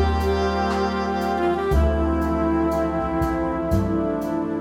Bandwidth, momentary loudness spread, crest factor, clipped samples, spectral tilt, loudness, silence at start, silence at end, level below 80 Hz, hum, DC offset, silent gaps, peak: 16 kHz; 3 LU; 12 dB; under 0.1%; -7.5 dB/octave; -22 LUFS; 0 s; 0 s; -28 dBFS; none; under 0.1%; none; -8 dBFS